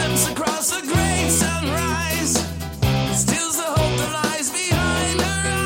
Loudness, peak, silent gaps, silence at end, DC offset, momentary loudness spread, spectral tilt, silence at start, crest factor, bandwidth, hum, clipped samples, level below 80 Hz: -20 LUFS; -6 dBFS; none; 0 s; under 0.1%; 3 LU; -3.5 dB/octave; 0 s; 16 dB; 17 kHz; none; under 0.1%; -34 dBFS